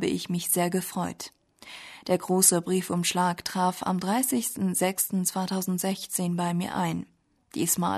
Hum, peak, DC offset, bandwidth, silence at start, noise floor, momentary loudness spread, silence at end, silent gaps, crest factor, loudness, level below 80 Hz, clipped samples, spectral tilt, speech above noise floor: none; -6 dBFS; under 0.1%; 13.5 kHz; 0 s; -47 dBFS; 15 LU; 0 s; none; 22 dB; -26 LUFS; -66 dBFS; under 0.1%; -4 dB/octave; 20 dB